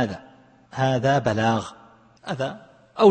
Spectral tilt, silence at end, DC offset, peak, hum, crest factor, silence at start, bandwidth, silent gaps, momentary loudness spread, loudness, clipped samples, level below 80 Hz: -6.5 dB/octave; 0 s; under 0.1%; -4 dBFS; none; 18 dB; 0 s; 8.8 kHz; none; 20 LU; -23 LUFS; under 0.1%; -58 dBFS